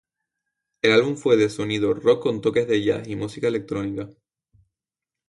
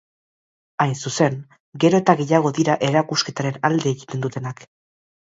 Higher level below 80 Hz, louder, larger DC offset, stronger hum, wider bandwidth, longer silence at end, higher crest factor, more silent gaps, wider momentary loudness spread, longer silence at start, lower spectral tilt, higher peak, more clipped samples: first, -58 dBFS vs -64 dBFS; about the same, -22 LUFS vs -20 LUFS; neither; neither; first, 11.5 kHz vs 8 kHz; first, 1.2 s vs 0.75 s; about the same, 20 dB vs 20 dB; second, none vs 1.60-1.72 s; second, 11 LU vs 14 LU; about the same, 0.85 s vs 0.8 s; about the same, -5.5 dB/octave vs -5.5 dB/octave; about the same, -4 dBFS vs -2 dBFS; neither